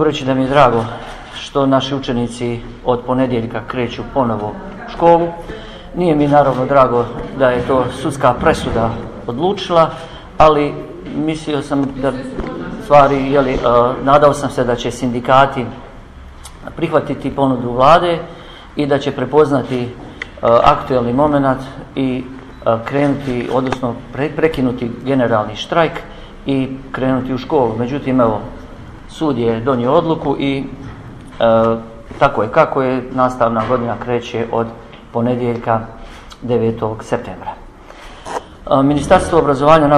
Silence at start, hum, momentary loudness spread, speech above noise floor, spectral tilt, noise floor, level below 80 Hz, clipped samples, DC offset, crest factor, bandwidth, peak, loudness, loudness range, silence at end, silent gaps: 0 s; none; 18 LU; 21 dB; -6.5 dB/octave; -36 dBFS; -36 dBFS; under 0.1%; under 0.1%; 16 dB; 12.5 kHz; 0 dBFS; -15 LUFS; 4 LU; 0 s; none